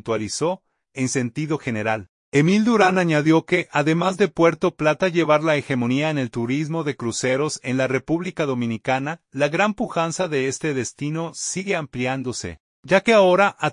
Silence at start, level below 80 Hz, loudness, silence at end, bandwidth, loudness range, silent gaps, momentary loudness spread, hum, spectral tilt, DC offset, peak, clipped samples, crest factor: 0.05 s; -58 dBFS; -21 LUFS; 0 s; 11 kHz; 5 LU; 2.09-2.32 s, 12.60-12.83 s; 9 LU; none; -5 dB/octave; under 0.1%; -2 dBFS; under 0.1%; 18 dB